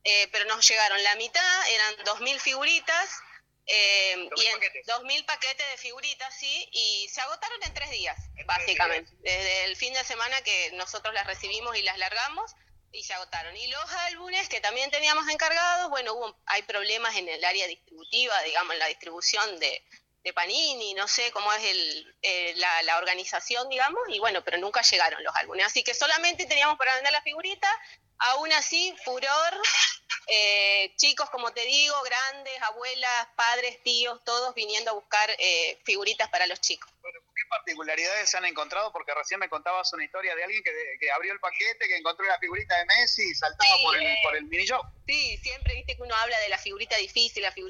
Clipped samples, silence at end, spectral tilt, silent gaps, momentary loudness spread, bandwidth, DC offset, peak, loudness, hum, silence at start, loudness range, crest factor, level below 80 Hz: under 0.1%; 0 s; 0 dB/octave; none; 11 LU; 16 kHz; under 0.1%; -6 dBFS; -25 LUFS; 50 Hz at -80 dBFS; 0.05 s; 6 LU; 20 dB; -52 dBFS